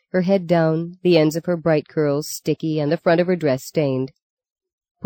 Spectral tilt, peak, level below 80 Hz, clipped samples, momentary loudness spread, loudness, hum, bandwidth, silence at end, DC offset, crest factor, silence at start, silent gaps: -6.5 dB/octave; -2 dBFS; -62 dBFS; under 0.1%; 6 LU; -20 LUFS; none; 17 kHz; 0 s; under 0.1%; 18 dB; 0.15 s; 4.22-4.37 s, 4.52-4.56 s, 4.73-4.78 s, 4.91-4.95 s